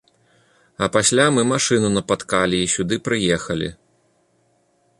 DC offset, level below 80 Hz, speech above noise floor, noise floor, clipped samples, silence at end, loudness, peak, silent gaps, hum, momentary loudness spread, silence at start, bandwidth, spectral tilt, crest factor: under 0.1%; -50 dBFS; 44 dB; -63 dBFS; under 0.1%; 1.25 s; -19 LUFS; -2 dBFS; none; none; 9 LU; 0.8 s; 11.5 kHz; -3.5 dB/octave; 18 dB